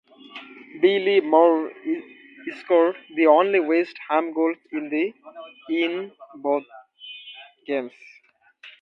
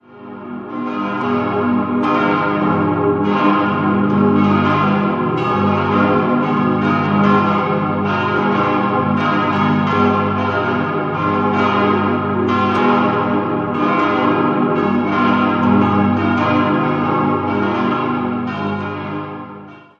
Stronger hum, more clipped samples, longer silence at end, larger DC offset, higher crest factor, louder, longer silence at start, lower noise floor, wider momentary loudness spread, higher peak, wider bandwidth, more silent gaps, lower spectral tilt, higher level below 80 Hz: second, none vs 50 Hz at -35 dBFS; neither; about the same, 0.1 s vs 0.2 s; neither; first, 20 dB vs 14 dB; second, -22 LUFS vs -16 LUFS; first, 0.35 s vs 0.1 s; first, -52 dBFS vs -36 dBFS; first, 23 LU vs 7 LU; about the same, -4 dBFS vs -2 dBFS; second, 5.8 kHz vs 6.6 kHz; neither; second, -6.5 dB/octave vs -8.5 dB/octave; second, -80 dBFS vs -44 dBFS